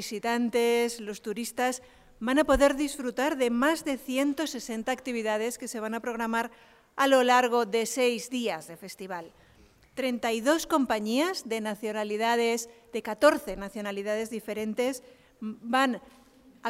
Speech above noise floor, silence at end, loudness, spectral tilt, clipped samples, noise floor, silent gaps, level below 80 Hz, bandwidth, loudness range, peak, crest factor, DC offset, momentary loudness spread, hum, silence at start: 31 dB; 0 s; -28 LUFS; -3 dB/octave; under 0.1%; -59 dBFS; none; -52 dBFS; 16 kHz; 3 LU; -8 dBFS; 20 dB; under 0.1%; 14 LU; none; 0 s